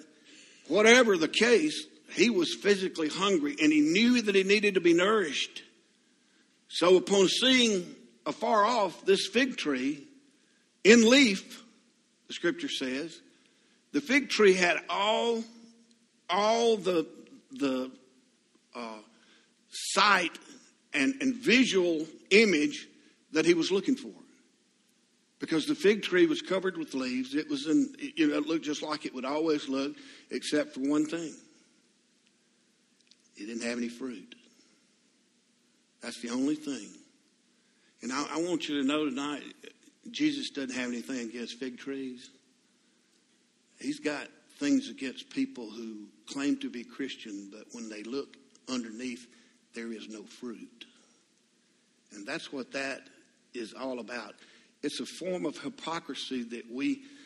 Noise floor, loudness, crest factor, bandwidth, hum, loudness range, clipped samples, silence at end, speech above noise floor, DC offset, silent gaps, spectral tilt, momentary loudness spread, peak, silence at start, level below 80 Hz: -69 dBFS; -28 LUFS; 26 dB; 12.5 kHz; none; 15 LU; under 0.1%; 0.1 s; 40 dB; under 0.1%; none; -3.5 dB/octave; 20 LU; -4 dBFS; 0.65 s; -78 dBFS